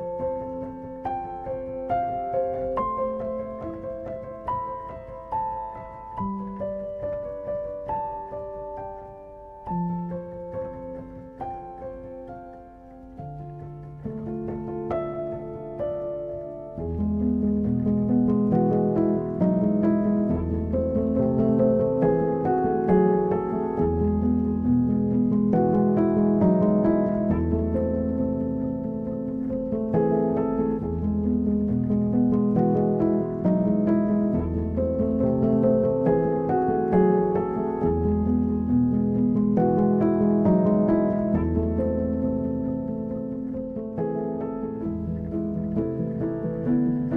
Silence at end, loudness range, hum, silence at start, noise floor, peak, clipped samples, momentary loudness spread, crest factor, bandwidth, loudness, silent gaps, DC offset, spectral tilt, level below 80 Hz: 0 s; 12 LU; none; 0 s; -45 dBFS; -8 dBFS; under 0.1%; 14 LU; 16 dB; 3.2 kHz; -25 LUFS; none; under 0.1%; -12.5 dB/octave; -42 dBFS